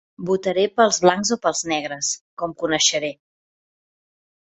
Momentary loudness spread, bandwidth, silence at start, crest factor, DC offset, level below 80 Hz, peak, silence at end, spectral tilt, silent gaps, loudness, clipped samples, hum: 10 LU; 8.4 kHz; 0.2 s; 20 dB; under 0.1%; -62 dBFS; -2 dBFS; 1.3 s; -2.5 dB/octave; 2.21-2.37 s; -20 LUFS; under 0.1%; none